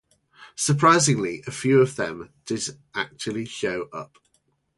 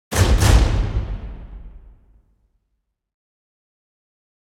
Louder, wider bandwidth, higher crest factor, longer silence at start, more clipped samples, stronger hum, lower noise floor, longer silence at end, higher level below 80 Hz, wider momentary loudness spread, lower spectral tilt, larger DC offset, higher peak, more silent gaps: second, -23 LUFS vs -18 LUFS; second, 11.5 kHz vs 16.5 kHz; about the same, 20 dB vs 20 dB; first, 0.4 s vs 0.1 s; neither; neither; second, -69 dBFS vs -74 dBFS; second, 0.7 s vs 2.65 s; second, -62 dBFS vs -24 dBFS; second, 19 LU vs 23 LU; about the same, -4.5 dB/octave vs -5 dB/octave; neither; about the same, -4 dBFS vs -2 dBFS; neither